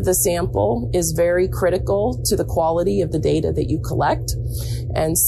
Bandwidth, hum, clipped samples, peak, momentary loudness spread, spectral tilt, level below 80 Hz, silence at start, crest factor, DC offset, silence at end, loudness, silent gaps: 14 kHz; none; under 0.1%; -6 dBFS; 5 LU; -5 dB/octave; -30 dBFS; 0 s; 12 dB; under 0.1%; 0 s; -20 LUFS; none